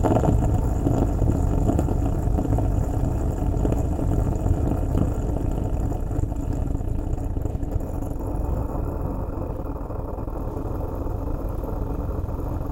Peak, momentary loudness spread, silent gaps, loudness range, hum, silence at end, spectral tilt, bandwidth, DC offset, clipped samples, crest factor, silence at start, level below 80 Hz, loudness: -4 dBFS; 7 LU; none; 6 LU; none; 0 s; -9 dB/octave; 16.5 kHz; under 0.1%; under 0.1%; 18 dB; 0 s; -26 dBFS; -26 LUFS